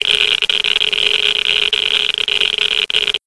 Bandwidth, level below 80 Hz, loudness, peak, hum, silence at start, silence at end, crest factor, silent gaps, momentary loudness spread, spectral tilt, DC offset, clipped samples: 11 kHz; -50 dBFS; -13 LUFS; 0 dBFS; none; 0 s; 0.1 s; 16 dB; none; 2 LU; 0.5 dB/octave; 0.6%; under 0.1%